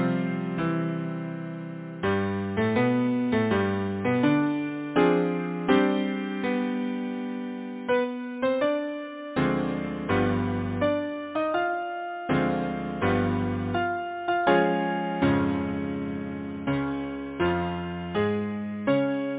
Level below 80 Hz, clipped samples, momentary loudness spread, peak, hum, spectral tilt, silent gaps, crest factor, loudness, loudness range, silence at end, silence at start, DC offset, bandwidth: -50 dBFS; under 0.1%; 10 LU; -8 dBFS; none; -11 dB/octave; none; 18 dB; -27 LUFS; 4 LU; 0 s; 0 s; under 0.1%; 4 kHz